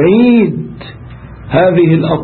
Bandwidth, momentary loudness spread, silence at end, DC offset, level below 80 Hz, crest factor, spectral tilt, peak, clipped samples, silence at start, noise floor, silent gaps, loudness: 4.5 kHz; 24 LU; 0 s; under 0.1%; -38 dBFS; 10 dB; -13 dB/octave; 0 dBFS; under 0.1%; 0 s; -30 dBFS; none; -10 LUFS